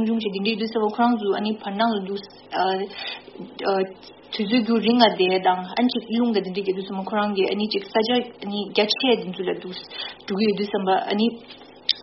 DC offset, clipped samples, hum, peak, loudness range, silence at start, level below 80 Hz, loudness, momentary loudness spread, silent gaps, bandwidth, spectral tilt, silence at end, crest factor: under 0.1%; under 0.1%; none; 0 dBFS; 3 LU; 0 s; -66 dBFS; -23 LUFS; 12 LU; none; 6 kHz; -3 dB/octave; 0 s; 22 dB